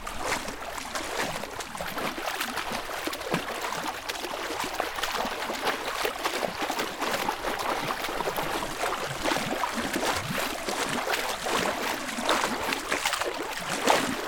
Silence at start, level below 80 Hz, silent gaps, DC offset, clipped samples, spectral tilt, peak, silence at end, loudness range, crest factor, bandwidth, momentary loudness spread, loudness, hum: 0 s; -50 dBFS; none; under 0.1%; under 0.1%; -2.5 dB/octave; -6 dBFS; 0 s; 4 LU; 24 dB; 19 kHz; 6 LU; -29 LUFS; none